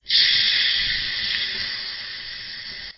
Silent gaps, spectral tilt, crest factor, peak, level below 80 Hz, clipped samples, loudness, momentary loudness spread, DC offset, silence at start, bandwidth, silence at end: none; -2.5 dB/octave; 18 dB; -4 dBFS; -50 dBFS; under 0.1%; -20 LUFS; 16 LU; under 0.1%; 0.05 s; 6 kHz; 0.05 s